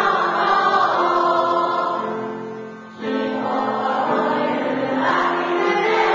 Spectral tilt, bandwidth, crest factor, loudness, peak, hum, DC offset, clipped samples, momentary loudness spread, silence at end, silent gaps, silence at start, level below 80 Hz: -5 dB/octave; 8 kHz; 14 dB; -19 LUFS; -4 dBFS; none; under 0.1%; under 0.1%; 11 LU; 0 s; none; 0 s; -64 dBFS